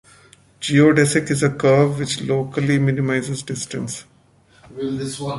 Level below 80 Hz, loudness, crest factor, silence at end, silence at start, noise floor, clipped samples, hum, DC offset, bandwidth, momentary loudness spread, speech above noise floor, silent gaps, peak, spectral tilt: -54 dBFS; -19 LUFS; 18 dB; 0 s; 0.6 s; -54 dBFS; under 0.1%; none; under 0.1%; 11.5 kHz; 14 LU; 35 dB; none; -2 dBFS; -5.5 dB/octave